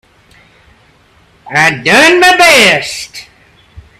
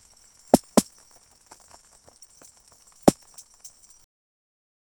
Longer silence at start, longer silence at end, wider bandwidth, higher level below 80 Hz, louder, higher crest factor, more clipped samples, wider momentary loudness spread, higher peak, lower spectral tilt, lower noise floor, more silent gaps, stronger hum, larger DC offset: first, 1.45 s vs 0.55 s; second, 0.2 s vs 1.9 s; about the same, over 20 kHz vs over 20 kHz; first, -46 dBFS vs -56 dBFS; first, -6 LUFS vs -22 LUFS; second, 12 dB vs 28 dB; first, 0.5% vs under 0.1%; second, 16 LU vs 26 LU; about the same, 0 dBFS vs 0 dBFS; second, -2.5 dB/octave vs -5 dB/octave; second, -46 dBFS vs -56 dBFS; neither; neither; neither